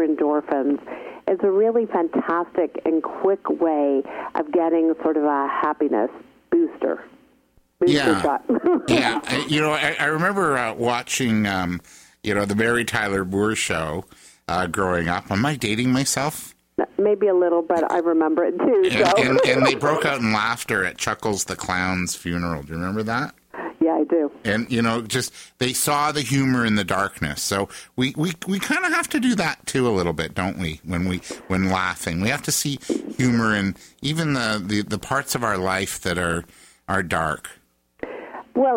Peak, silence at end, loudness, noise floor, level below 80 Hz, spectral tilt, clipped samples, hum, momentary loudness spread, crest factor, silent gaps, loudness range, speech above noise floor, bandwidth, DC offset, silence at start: -4 dBFS; 0 s; -22 LUFS; -60 dBFS; -50 dBFS; -4.5 dB/octave; under 0.1%; none; 9 LU; 18 dB; none; 5 LU; 38 dB; 16.5 kHz; under 0.1%; 0 s